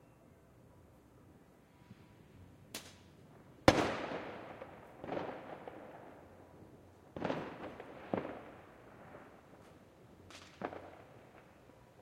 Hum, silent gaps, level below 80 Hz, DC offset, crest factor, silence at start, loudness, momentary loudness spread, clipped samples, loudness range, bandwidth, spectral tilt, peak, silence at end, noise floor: none; none; -64 dBFS; under 0.1%; 36 dB; 0 s; -40 LUFS; 23 LU; under 0.1%; 15 LU; 16 kHz; -5 dB/octave; -6 dBFS; 0 s; -63 dBFS